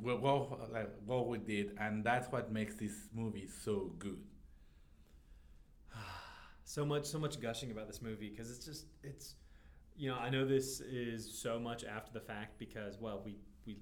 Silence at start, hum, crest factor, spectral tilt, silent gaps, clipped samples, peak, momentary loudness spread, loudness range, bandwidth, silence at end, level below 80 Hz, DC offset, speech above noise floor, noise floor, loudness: 0 s; none; 22 dB; -5 dB/octave; none; under 0.1%; -20 dBFS; 17 LU; 7 LU; over 20 kHz; 0 s; -62 dBFS; under 0.1%; 22 dB; -62 dBFS; -41 LUFS